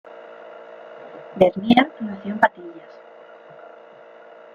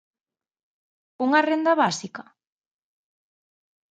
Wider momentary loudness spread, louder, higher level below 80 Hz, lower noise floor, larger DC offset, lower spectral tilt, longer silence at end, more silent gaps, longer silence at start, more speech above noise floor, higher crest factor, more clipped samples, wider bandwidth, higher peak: first, 26 LU vs 17 LU; first, -19 LUFS vs -22 LUFS; first, -60 dBFS vs -78 dBFS; second, -45 dBFS vs under -90 dBFS; neither; first, -7 dB/octave vs -4 dB/octave; about the same, 1.75 s vs 1.8 s; neither; second, 0.1 s vs 1.2 s; second, 25 dB vs over 68 dB; about the same, 24 dB vs 22 dB; neither; second, 7 kHz vs 9.2 kHz; first, 0 dBFS vs -6 dBFS